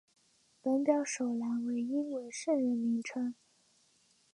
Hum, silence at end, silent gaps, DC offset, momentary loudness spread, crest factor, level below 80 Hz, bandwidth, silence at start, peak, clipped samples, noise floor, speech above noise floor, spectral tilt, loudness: none; 1 s; none; under 0.1%; 8 LU; 18 dB; -88 dBFS; 11 kHz; 0.65 s; -16 dBFS; under 0.1%; -70 dBFS; 37 dB; -4.5 dB/octave; -34 LUFS